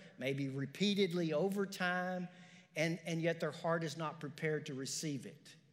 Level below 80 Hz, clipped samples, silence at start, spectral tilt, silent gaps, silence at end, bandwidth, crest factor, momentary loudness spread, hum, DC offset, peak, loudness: under -90 dBFS; under 0.1%; 0 s; -5 dB/octave; none; 0.15 s; 16 kHz; 18 dB; 9 LU; none; under 0.1%; -22 dBFS; -38 LUFS